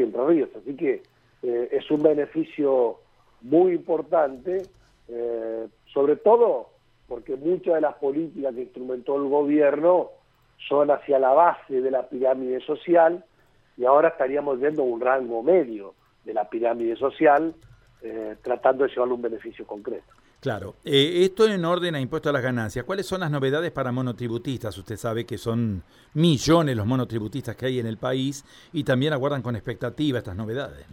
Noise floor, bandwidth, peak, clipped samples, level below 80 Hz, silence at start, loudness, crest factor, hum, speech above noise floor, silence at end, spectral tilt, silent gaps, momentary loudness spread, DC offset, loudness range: -60 dBFS; 16 kHz; -4 dBFS; under 0.1%; -56 dBFS; 0 s; -24 LUFS; 20 dB; none; 37 dB; 0 s; -6.5 dB/octave; none; 14 LU; under 0.1%; 5 LU